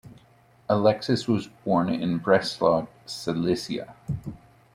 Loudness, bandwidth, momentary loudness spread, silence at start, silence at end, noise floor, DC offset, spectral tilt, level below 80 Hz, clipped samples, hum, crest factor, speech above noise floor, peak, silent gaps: -25 LUFS; 15.5 kHz; 12 LU; 0.05 s; 0.4 s; -57 dBFS; under 0.1%; -6 dB/octave; -56 dBFS; under 0.1%; none; 20 dB; 33 dB; -6 dBFS; none